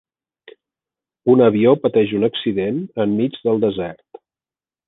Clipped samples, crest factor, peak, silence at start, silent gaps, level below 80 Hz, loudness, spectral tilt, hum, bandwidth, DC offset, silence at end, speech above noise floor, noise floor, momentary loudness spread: under 0.1%; 16 dB; -2 dBFS; 1.25 s; none; -58 dBFS; -17 LUFS; -10 dB/octave; none; 4 kHz; under 0.1%; 0.95 s; over 73 dB; under -90 dBFS; 10 LU